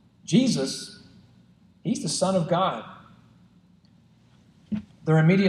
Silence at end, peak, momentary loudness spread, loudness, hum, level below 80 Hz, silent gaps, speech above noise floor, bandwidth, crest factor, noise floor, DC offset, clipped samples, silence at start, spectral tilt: 0 s; -8 dBFS; 14 LU; -25 LUFS; none; -64 dBFS; none; 35 dB; 12 kHz; 18 dB; -57 dBFS; under 0.1%; under 0.1%; 0.3 s; -5.5 dB/octave